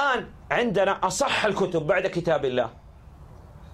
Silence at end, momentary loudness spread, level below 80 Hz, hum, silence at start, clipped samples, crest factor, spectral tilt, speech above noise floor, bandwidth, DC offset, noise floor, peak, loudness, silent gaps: 0 s; 5 LU; -50 dBFS; none; 0 s; under 0.1%; 18 dB; -4 dB/octave; 22 dB; 14.5 kHz; under 0.1%; -46 dBFS; -8 dBFS; -24 LUFS; none